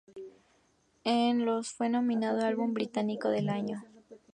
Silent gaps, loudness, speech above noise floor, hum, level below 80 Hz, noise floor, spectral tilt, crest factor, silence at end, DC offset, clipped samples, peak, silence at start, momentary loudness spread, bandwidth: none; -31 LUFS; 40 dB; none; -78 dBFS; -69 dBFS; -5.5 dB/octave; 16 dB; 0.15 s; under 0.1%; under 0.1%; -16 dBFS; 0.15 s; 14 LU; 10 kHz